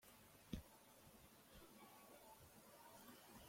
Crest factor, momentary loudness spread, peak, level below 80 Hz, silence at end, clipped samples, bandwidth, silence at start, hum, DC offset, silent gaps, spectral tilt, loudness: 28 dB; 10 LU; -34 dBFS; -72 dBFS; 0 s; under 0.1%; 16.5 kHz; 0 s; none; under 0.1%; none; -4.5 dB/octave; -62 LUFS